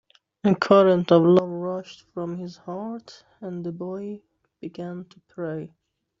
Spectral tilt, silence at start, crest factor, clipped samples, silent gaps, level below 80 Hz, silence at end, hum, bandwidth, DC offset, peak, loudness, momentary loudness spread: -6.5 dB/octave; 0.45 s; 20 dB; under 0.1%; none; -68 dBFS; 0.55 s; none; 7.6 kHz; under 0.1%; -4 dBFS; -22 LUFS; 23 LU